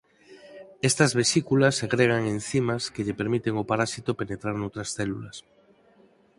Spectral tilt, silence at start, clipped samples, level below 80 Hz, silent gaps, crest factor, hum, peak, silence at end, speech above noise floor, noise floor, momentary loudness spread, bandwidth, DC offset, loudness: -4.5 dB/octave; 0.3 s; under 0.1%; -58 dBFS; none; 22 dB; none; -6 dBFS; 1 s; 34 dB; -59 dBFS; 11 LU; 11.5 kHz; under 0.1%; -25 LUFS